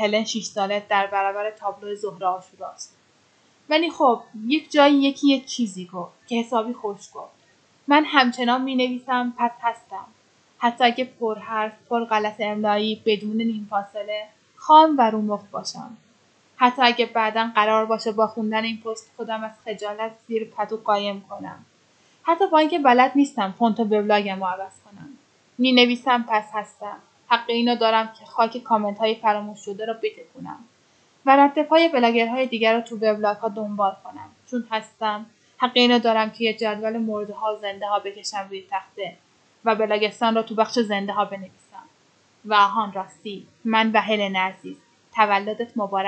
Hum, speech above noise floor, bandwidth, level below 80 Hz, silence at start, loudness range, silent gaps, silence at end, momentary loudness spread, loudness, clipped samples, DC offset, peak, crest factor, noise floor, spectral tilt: none; 38 dB; 8.8 kHz; -82 dBFS; 0 s; 5 LU; none; 0 s; 17 LU; -22 LUFS; under 0.1%; under 0.1%; 0 dBFS; 22 dB; -60 dBFS; -4 dB/octave